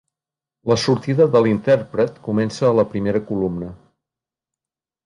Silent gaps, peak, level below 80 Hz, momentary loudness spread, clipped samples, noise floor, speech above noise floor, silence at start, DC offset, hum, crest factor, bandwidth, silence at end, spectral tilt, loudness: none; -4 dBFS; -52 dBFS; 9 LU; under 0.1%; -90 dBFS; 72 dB; 0.65 s; under 0.1%; none; 16 dB; 11 kHz; 1.3 s; -6.5 dB/octave; -19 LUFS